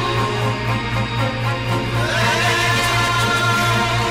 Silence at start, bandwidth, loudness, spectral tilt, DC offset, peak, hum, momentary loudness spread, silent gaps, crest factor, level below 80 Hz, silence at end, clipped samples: 0 s; 16 kHz; -18 LUFS; -4 dB/octave; under 0.1%; -8 dBFS; none; 5 LU; none; 12 dB; -36 dBFS; 0 s; under 0.1%